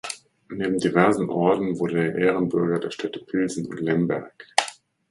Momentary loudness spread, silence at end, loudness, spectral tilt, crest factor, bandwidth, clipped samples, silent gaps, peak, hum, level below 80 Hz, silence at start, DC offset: 11 LU; 0.35 s; -23 LUFS; -5.5 dB/octave; 24 dB; 11.5 kHz; under 0.1%; none; 0 dBFS; none; -62 dBFS; 0.05 s; under 0.1%